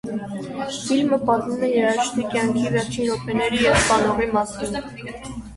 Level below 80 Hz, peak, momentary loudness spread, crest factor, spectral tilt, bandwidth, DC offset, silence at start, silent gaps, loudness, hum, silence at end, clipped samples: -44 dBFS; -4 dBFS; 13 LU; 18 dB; -4.5 dB/octave; 11.5 kHz; under 0.1%; 0.05 s; none; -21 LUFS; none; 0 s; under 0.1%